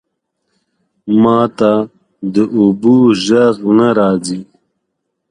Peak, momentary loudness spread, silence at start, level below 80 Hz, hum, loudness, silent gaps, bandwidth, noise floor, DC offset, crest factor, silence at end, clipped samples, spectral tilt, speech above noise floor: 0 dBFS; 14 LU; 1.05 s; -52 dBFS; none; -12 LUFS; none; 10.5 kHz; -72 dBFS; under 0.1%; 14 dB; 0.85 s; under 0.1%; -6.5 dB/octave; 61 dB